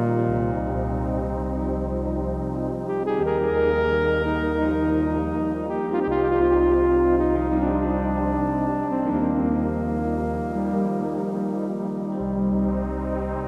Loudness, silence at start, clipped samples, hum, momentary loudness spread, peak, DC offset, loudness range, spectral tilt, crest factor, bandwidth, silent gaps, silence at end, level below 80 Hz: -24 LUFS; 0 s; under 0.1%; none; 7 LU; -10 dBFS; under 0.1%; 4 LU; -9.5 dB/octave; 14 dB; 7 kHz; none; 0 s; -34 dBFS